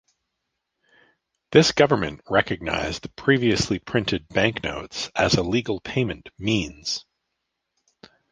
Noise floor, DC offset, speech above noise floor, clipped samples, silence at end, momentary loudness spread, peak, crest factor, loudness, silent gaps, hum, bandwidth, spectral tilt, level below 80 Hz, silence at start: -79 dBFS; under 0.1%; 57 dB; under 0.1%; 1.3 s; 11 LU; -2 dBFS; 22 dB; -23 LUFS; none; none; 10 kHz; -4.5 dB/octave; -46 dBFS; 1.5 s